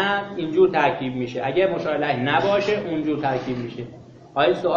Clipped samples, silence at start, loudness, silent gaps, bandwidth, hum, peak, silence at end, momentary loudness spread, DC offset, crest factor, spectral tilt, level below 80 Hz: under 0.1%; 0 s; -22 LUFS; none; 7.2 kHz; none; -6 dBFS; 0 s; 11 LU; under 0.1%; 16 dB; -6.5 dB/octave; -56 dBFS